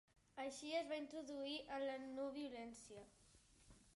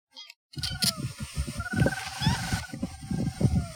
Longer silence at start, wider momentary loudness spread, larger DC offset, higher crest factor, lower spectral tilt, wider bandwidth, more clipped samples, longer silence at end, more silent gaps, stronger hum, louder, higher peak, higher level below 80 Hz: first, 0.35 s vs 0.15 s; first, 16 LU vs 11 LU; neither; about the same, 18 dB vs 20 dB; second, -3 dB/octave vs -4.5 dB/octave; second, 11.5 kHz vs over 20 kHz; neither; about the same, 0 s vs 0 s; second, none vs 0.36-0.49 s; neither; second, -49 LUFS vs -30 LUFS; second, -32 dBFS vs -10 dBFS; second, -78 dBFS vs -42 dBFS